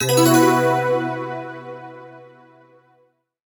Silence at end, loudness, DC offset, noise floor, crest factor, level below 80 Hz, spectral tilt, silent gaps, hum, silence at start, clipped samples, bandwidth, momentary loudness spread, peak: 1.25 s; -17 LUFS; under 0.1%; -62 dBFS; 18 dB; -66 dBFS; -4.5 dB/octave; none; none; 0 s; under 0.1%; 19.5 kHz; 23 LU; -2 dBFS